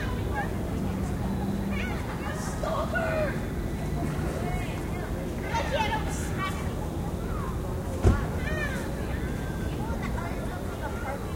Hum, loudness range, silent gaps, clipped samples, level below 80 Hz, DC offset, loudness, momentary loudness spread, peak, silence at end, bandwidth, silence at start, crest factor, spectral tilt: none; 1 LU; none; under 0.1%; -36 dBFS; under 0.1%; -30 LUFS; 5 LU; -6 dBFS; 0 s; 16 kHz; 0 s; 22 dB; -6 dB/octave